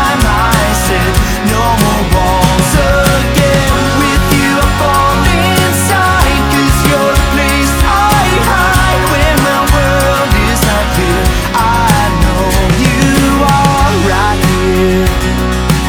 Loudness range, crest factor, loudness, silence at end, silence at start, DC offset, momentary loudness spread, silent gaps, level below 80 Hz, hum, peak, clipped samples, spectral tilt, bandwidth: 1 LU; 10 dB; -10 LUFS; 0 s; 0 s; under 0.1%; 2 LU; none; -16 dBFS; none; 0 dBFS; under 0.1%; -4.5 dB/octave; over 20 kHz